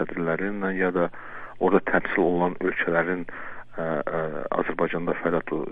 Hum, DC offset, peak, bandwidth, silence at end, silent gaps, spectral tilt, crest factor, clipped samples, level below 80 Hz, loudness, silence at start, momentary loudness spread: none; under 0.1%; -6 dBFS; 4.7 kHz; 0 s; none; -9.5 dB/octave; 20 dB; under 0.1%; -52 dBFS; -25 LUFS; 0 s; 10 LU